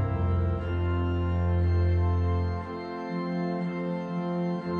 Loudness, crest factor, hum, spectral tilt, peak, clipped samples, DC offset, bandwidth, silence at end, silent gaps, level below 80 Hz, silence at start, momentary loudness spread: -29 LUFS; 10 dB; none; -9.5 dB/octave; -16 dBFS; under 0.1%; under 0.1%; 4.5 kHz; 0 s; none; -38 dBFS; 0 s; 7 LU